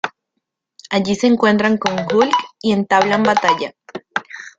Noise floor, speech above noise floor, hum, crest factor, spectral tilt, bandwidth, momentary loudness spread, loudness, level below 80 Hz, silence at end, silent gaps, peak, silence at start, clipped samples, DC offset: -76 dBFS; 60 dB; none; 18 dB; -5 dB/octave; 7.8 kHz; 12 LU; -16 LUFS; -58 dBFS; 0.1 s; none; 0 dBFS; 0.05 s; under 0.1%; under 0.1%